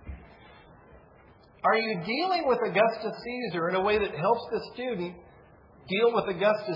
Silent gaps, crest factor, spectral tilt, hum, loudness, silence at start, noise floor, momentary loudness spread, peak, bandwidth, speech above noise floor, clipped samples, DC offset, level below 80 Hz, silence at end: none; 18 dB; -7.5 dB/octave; none; -27 LUFS; 0.05 s; -56 dBFS; 10 LU; -10 dBFS; 5.6 kHz; 29 dB; under 0.1%; under 0.1%; -56 dBFS; 0 s